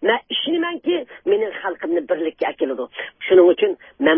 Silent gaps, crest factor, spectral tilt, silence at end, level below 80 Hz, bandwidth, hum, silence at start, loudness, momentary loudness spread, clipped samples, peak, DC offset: none; 18 dB; -9 dB/octave; 0 s; -66 dBFS; 3.7 kHz; none; 0 s; -20 LUFS; 12 LU; under 0.1%; -2 dBFS; under 0.1%